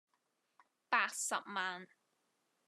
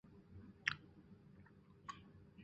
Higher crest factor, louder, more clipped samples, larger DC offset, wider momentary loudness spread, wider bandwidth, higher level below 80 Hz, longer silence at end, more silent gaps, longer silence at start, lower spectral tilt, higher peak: second, 24 dB vs 36 dB; first, -37 LUFS vs -47 LUFS; neither; neither; second, 8 LU vs 21 LU; first, 13 kHz vs 7.6 kHz; second, under -90 dBFS vs -72 dBFS; first, 0.8 s vs 0 s; neither; first, 0.9 s vs 0.05 s; about the same, -0.5 dB/octave vs -1.5 dB/octave; about the same, -18 dBFS vs -16 dBFS